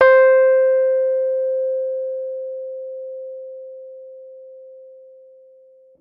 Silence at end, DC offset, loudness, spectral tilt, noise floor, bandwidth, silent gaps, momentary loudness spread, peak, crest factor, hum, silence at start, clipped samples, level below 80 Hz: 1.1 s; under 0.1%; -18 LUFS; -4.5 dB/octave; -49 dBFS; 5 kHz; none; 26 LU; -2 dBFS; 18 dB; 50 Hz at -90 dBFS; 0 s; under 0.1%; -70 dBFS